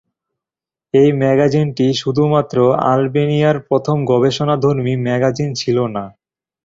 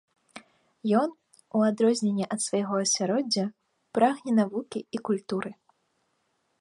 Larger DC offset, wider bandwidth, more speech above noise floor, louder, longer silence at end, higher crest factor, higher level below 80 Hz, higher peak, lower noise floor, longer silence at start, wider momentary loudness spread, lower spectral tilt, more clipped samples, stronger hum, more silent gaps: neither; second, 7.8 kHz vs 11.5 kHz; first, 74 dB vs 48 dB; first, -15 LUFS vs -27 LUFS; second, 0.55 s vs 1.1 s; second, 14 dB vs 20 dB; first, -52 dBFS vs -76 dBFS; first, -2 dBFS vs -8 dBFS; first, -89 dBFS vs -74 dBFS; first, 0.95 s vs 0.35 s; second, 5 LU vs 10 LU; first, -7 dB/octave vs -4.5 dB/octave; neither; neither; neither